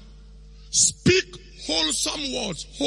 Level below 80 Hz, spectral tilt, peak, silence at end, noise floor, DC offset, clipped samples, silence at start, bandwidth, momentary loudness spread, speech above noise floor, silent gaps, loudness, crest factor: -46 dBFS; -2 dB/octave; -6 dBFS; 0 s; -45 dBFS; under 0.1%; under 0.1%; 0 s; 11.5 kHz; 13 LU; 22 dB; none; -22 LUFS; 20 dB